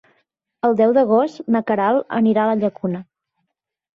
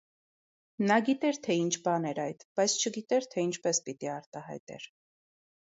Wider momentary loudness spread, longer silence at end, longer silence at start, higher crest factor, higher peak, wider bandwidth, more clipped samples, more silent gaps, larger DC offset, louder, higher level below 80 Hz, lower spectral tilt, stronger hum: second, 9 LU vs 16 LU; about the same, 0.9 s vs 0.9 s; second, 0.65 s vs 0.8 s; second, 14 dB vs 20 dB; first, -4 dBFS vs -12 dBFS; second, 6.4 kHz vs 8 kHz; neither; second, none vs 2.45-2.56 s, 4.26-4.32 s, 4.60-4.67 s; neither; first, -18 LUFS vs -30 LUFS; first, -64 dBFS vs -80 dBFS; first, -8.5 dB/octave vs -3.5 dB/octave; neither